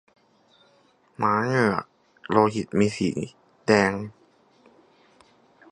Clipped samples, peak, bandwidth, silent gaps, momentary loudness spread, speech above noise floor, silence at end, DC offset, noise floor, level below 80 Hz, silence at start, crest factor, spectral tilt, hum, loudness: under 0.1%; -2 dBFS; 11 kHz; none; 13 LU; 39 dB; 1.6 s; under 0.1%; -61 dBFS; -58 dBFS; 1.2 s; 24 dB; -6 dB/octave; none; -24 LUFS